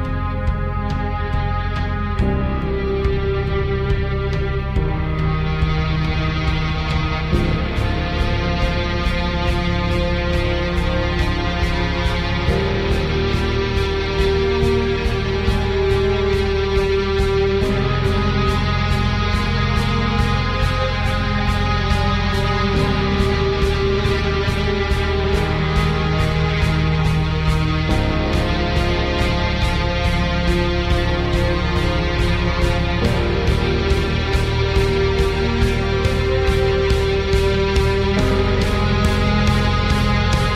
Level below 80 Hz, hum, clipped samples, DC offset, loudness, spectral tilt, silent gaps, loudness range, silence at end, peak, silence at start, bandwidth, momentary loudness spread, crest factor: -22 dBFS; none; under 0.1%; under 0.1%; -19 LUFS; -6.5 dB/octave; none; 3 LU; 0 s; -2 dBFS; 0 s; 13 kHz; 3 LU; 16 dB